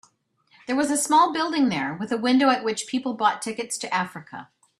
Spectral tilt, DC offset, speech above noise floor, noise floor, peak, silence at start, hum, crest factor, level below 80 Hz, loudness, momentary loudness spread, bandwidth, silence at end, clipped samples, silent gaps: -3 dB/octave; under 0.1%; 41 dB; -64 dBFS; -6 dBFS; 0.7 s; none; 18 dB; -68 dBFS; -23 LUFS; 13 LU; 13.5 kHz; 0.35 s; under 0.1%; none